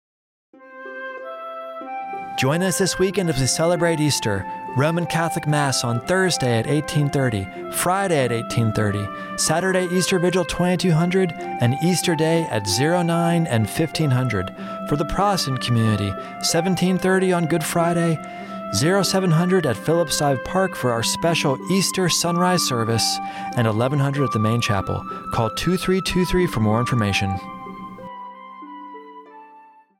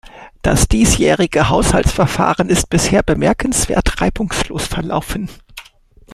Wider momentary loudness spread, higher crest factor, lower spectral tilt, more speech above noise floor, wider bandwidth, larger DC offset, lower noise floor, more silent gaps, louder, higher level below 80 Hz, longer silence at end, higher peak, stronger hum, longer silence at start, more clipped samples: first, 13 LU vs 9 LU; about the same, 14 dB vs 16 dB; about the same, -5 dB/octave vs -4.5 dB/octave; about the same, 28 dB vs 31 dB; first, 16.5 kHz vs 14.5 kHz; neither; about the same, -49 dBFS vs -46 dBFS; neither; second, -20 LUFS vs -15 LUFS; second, -46 dBFS vs -24 dBFS; first, 0.4 s vs 0 s; second, -8 dBFS vs 0 dBFS; neither; first, 0.6 s vs 0.05 s; neither